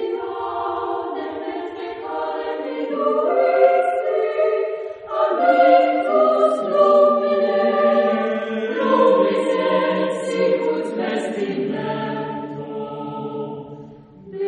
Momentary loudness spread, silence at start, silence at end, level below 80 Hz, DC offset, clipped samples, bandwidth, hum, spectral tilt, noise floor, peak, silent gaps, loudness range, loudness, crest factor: 14 LU; 0 s; 0 s; -66 dBFS; under 0.1%; under 0.1%; 10 kHz; none; -6 dB/octave; -41 dBFS; -2 dBFS; none; 8 LU; -19 LUFS; 16 dB